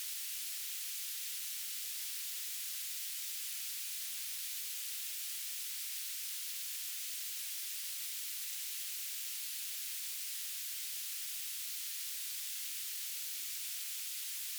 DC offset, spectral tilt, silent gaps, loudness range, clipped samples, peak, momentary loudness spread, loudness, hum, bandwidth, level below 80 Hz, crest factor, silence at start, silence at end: under 0.1%; 10 dB/octave; none; 0 LU; under 0.1%; -28 dBFS; 0 LU; -38 LUFS; none; over 20 kHz; under -90 dBFS; 14 dB; 0 s; 0 s